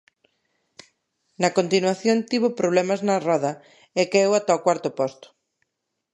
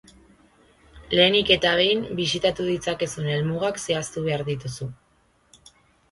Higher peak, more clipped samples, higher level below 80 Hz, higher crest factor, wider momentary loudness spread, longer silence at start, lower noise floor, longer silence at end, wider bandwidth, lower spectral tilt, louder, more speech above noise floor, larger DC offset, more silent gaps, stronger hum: about the same, -4 dBFS vs -4 dBFS; neither; second, -74 dBFS vs -52 dBFS; about the same, 20 dB vs 22 dB; second, 8 LU vs 12 LU; first, 1.4 s vs 0.95 s; first, -80 dBFS vs -63 dBFS; second, 1 s vs 1.15 s; about the same, 11.5 kHz vs 11.5 kHz; about the same, -4.5 dB/octave vs -4 dB/octave; about the same, -22 LUFS vs -22 LUFS; first, 58 dB vs 40 dB; neither; neither; neither